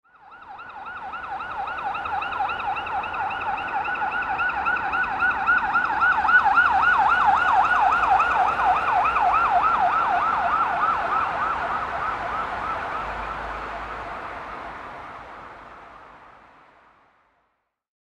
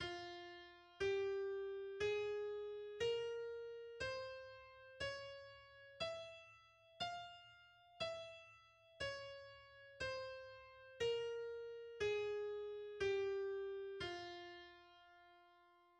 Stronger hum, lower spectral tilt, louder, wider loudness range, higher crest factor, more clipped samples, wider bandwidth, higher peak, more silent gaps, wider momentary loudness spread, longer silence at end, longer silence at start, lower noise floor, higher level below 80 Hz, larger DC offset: neither; about the same, -4 dB/octave vs -4 dB/octave; first, -22 LUFS vs -46 LUFS; first, 16 LU vs 7 LU; about the same, 18 dB vs 16 dB; neither; about the same, 10 kHz vs 9.8 kHz; first, -6 dBFS vs -30 dBFS; neither; about the same, 18 LU vs 19 LU; first, 1.7 s vs 0.25 s; first, 0.25 s vs 0 s; about the same, -73 dBFS vs -71 dBFS; first, -48 dBFS vs -74 dBFS; neither